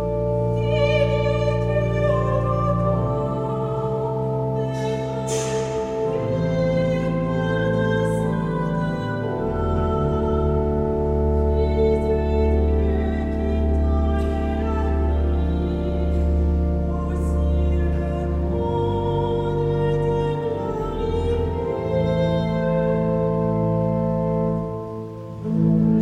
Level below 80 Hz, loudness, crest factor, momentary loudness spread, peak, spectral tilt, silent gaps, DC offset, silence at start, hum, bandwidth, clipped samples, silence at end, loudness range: -26 dBFS; -22 LUFS; 14 dB; 4 LU; -8 dBFS; -8 dB/octave; none; under 0.1%; 0 s; none; 10 kHz; under 0.1%; 0 s; 2 LU